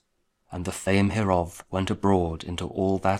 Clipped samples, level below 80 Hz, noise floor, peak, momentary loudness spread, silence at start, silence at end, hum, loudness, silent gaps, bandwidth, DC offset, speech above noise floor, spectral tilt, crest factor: under 0.1%; -46 dBFS; -71 dBFS; -6 dBFS; 10 LU; 0.5 s; 0 s; none; -26 LUFS; none; 14.5 kHz; under 0.1%; 46 dB; -6 dB/octave; 20 dB